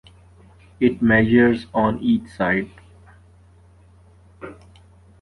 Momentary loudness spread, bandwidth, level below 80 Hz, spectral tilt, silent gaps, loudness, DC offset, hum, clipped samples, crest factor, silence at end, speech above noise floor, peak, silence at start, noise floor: 24 LU; 4.8 kHz; -48 dBFS; -8 dB/octave; none; -19 LUFS; under 0.1%; none; under 0.1%; 18 dB; 0.7 s; 32 dB; -4 dBFS; 0.8 s; -50 dBFS